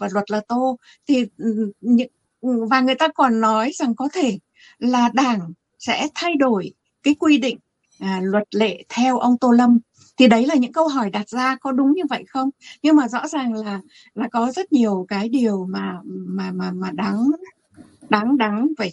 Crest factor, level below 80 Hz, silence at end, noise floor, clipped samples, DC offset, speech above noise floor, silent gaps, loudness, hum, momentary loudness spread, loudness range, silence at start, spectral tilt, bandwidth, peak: 18 dB; -66 dBFS; 0 s; -48 dBFS; under 0.1%; under 0.1%; 29 dB; none; -20 LUFS; none; 11 LU; 5 LU; 0 s; -5.5 dB/octave; 8.6 kHz; -2 dBFS